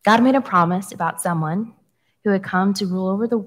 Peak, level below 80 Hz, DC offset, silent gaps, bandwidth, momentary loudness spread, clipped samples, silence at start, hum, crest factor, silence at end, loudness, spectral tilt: -2 dBFS; -68 dBFS; under 0.1%; none; 16 kHz; 10 LU; under 0.1%; 0.05 s; none; 18 dB; 0 s; -20 LUFS; -6 dB/octave